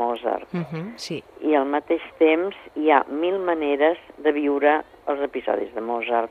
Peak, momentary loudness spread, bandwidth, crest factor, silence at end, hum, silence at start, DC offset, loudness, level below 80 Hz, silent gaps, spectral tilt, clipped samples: -2 dBFS; 10 LU; 11 kHz; 20 dB; 0 s; none; 0 s; under 0.1%; -23 LUFS; -64 dBFS; none; -6 dB/octave; under 0.1%